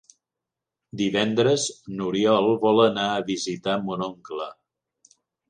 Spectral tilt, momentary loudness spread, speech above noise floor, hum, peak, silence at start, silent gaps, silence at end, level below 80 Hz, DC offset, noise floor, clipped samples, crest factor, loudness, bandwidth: -4.5 dB/octave; 14 LU; 64 dB; none; -6 dBFS; 0.95 s; none; 0.95 s; -66 dBFS; under 0.1%; -87 dBFS; under 0.1%; 18 dB; -23 LUFS; 10 kHz